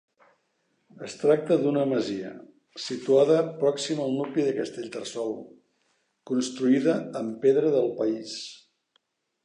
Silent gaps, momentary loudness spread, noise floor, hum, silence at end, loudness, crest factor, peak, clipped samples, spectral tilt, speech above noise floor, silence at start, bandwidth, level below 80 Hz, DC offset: none; 15 LU; -73 dBFS; none; 0.9 s; -26 LUFS; 18 dB; -8 dBFS; under 0.1%; -5.5 dB/octave; 48 dB; 1 s; 10.5 kHz; -78 dBFS; under 0.1%